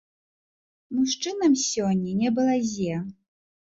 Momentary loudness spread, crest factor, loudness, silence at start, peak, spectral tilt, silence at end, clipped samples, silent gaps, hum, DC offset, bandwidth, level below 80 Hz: 9 LU; 14 dB; -25 LUFS; 0.9 s; -12 dBFS; -4.5 dB/octave; 0.65 s; under 0.1%; none; none; under 0.1%; 8 kHz; -62 dBFS